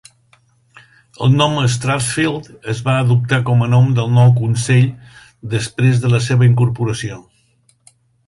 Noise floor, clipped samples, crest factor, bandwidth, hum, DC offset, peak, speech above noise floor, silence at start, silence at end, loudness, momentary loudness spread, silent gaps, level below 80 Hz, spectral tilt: -57 dBFS; under 0.1%; 14 dB; 11.5 kHz; none; under 0.1%; 0 dBFS; 43 dB; 1.2 s; 1.05 s; -15 LUFS; 11 LU; none; -48 dBFS; -6 dB/octave